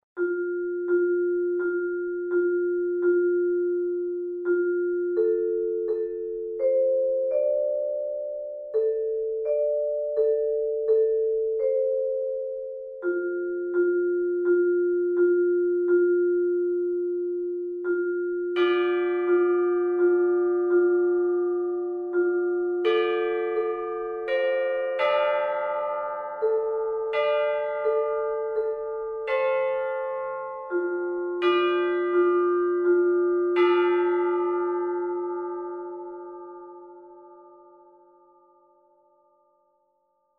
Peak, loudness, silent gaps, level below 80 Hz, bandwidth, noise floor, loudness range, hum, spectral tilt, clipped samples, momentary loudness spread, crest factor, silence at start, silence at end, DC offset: -10 dBFS; -25 LUFS; none; -66 dBFS; 4.3 kHz; -71 dBFS; 4 LU; none; -6.5 dB/octave; under 0.1%; 9 LU; 14 dB; 0.15 s; 2.9 s; under 0.1%